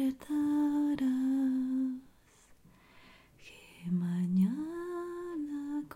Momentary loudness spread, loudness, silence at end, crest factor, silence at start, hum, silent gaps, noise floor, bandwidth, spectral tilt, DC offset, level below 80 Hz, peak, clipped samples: 14 LU; -33 LUFS; 0 s; 14 dB; 0 s; none; none; -62 dBFS; 15.5 kHz; -8 dB/octave; under 0.1%; -68 dBFS; -20 dBFS; under 0.1%